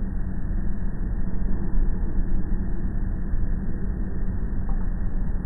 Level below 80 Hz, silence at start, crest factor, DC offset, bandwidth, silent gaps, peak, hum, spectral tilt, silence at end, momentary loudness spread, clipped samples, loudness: -24 dBFS; 0 s; 12 dB; under 0.1%; 2 kHz; none; -10 dBFS; none; -13 dB/octave; 0 s; 2 LU; under 0.1%; -30 LUFS